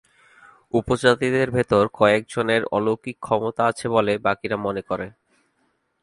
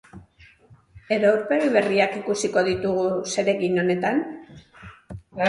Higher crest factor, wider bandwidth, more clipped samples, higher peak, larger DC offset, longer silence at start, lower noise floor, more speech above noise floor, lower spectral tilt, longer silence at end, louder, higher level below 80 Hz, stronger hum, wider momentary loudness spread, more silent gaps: about the same, 20 dB vs 20 dB; about the same, 11.5 kHz vs 11.5 kHz; neither; about the same, -2 dBFS vs -4 dBFS; neither; first, 0.75 s vs 0.15 s; first, -69 dBFS vs -53 dBFS; first, 48 dB vs 32 dB; about the same, -5.5 dB/octave vs -5 dB/octave; first, 0.95 s vs 0 s; about the same, -21 LUFS vs -22 LUFS; about the same, -52 dBFS vs -56 dBFS; neither; second, 8 LU vs 16 LU; neither